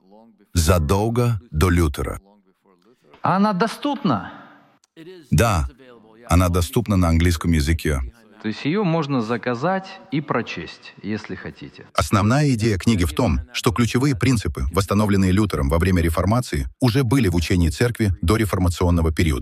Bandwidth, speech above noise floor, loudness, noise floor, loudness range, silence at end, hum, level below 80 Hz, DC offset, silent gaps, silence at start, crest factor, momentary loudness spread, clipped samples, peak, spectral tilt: 15.5 kHz; 38 dB; -20 LUFS; -58 dBFS; 5 LU; 0 s; none; -32 dBFS; under 0.1%; none; 0.55 s; 18 dB; 11 LU; under 0.1%; -2 dBFS; -6 dB/octave